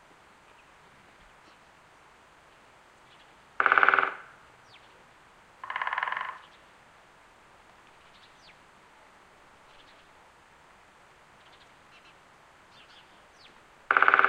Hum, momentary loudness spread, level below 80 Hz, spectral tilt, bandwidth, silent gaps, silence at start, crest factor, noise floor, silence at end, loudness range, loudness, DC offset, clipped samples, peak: none; 33 LU; -72 dBFS; -2.5 dB/octave; 10.5 kHz; none; 3.6 s; 32 dB; -57 dBFS; 0 s; 10 LU; -25 LUFS; under 0.1%; under 0.1%; -2 dBFS